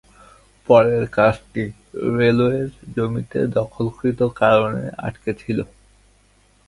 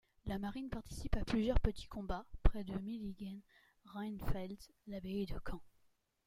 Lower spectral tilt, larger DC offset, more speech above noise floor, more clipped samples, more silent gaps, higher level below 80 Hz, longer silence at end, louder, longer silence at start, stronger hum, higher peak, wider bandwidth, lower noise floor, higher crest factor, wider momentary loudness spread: about the same, -8 dB/octave vs -7 dB/octave; neither; about the same, 37 dB vs 38 dB; neither; neither; second, -48 dBFS vs -42 dBFS; first, 1.05 s vs 0.6 s; first, -20 LUFS vs -42 LUFS; first, 0.7 s vs 0.25 s; neither; first, 0 dBFS vs -14 dBFS; second, 11.5 kHz vs 16 kHz; second, -56 dBFS vs -76 dBFS; about the same, 20 dB vs 24 dB; about the same, 13 LU vs 13 LU